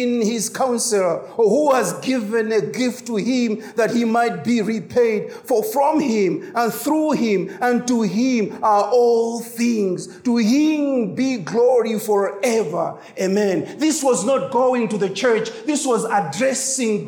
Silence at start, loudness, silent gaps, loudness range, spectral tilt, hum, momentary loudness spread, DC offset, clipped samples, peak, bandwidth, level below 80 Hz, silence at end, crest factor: 0 s; -19 LUFS; none; 1 LU; -4.5 dB/octave; none; 5 LU; under 0.1%; under 0.1%; -6 dBFS; over 20 kHz; -70 dBFS; 0 s; 12 dB